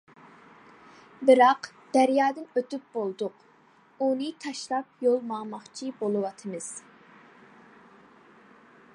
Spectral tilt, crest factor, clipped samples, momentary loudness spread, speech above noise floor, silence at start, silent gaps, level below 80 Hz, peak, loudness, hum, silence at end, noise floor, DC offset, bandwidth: -4.5 dB/octave; 22 dB; under 0.1%; 16 LU; 33 dB; 1.2 s; none; -82 dBFS; -6 dBFS; -27 LUFS; none; 2.15 s; -59 dBFS; under 0.1%; 11.5 kHz